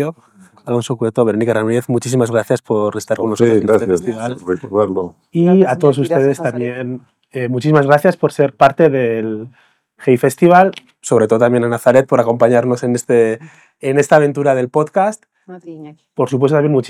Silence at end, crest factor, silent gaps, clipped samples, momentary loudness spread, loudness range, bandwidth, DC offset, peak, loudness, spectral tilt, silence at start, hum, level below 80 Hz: 0 s; 14 dB; none; 0.2%; 12 LU; 3 LU; 15 kHz; under 0.1%; 0 dBFS; -14 LUFS; -6.5 dB/octave; 0 s; none; -60 dBFS